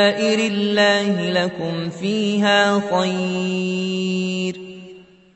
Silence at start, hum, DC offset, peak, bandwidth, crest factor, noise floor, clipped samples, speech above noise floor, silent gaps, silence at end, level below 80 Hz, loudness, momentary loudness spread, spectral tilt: 0 s; none; under 0.1%; -4 dBFS; 8.4 kHz; 16 dB; -43 dBFS; under 0.1%; 24 dB; none; 0.35 s; -64 dBFS; -19 LUFS; 9 LU; -5 dB/octave